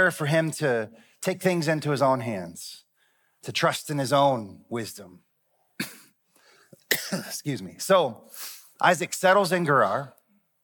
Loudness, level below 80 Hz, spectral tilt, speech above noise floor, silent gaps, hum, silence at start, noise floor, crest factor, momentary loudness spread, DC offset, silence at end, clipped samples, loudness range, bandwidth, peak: -25 LUFS; -78 dBFS; -4.5 dB/octave; 45 dB; none; none; 0 s; -70 dBFS; 22 dB; 16 LU; under 0.1%; 0.55 s; under 0.1%; 6 LU; 19 kHz; -6 dBFS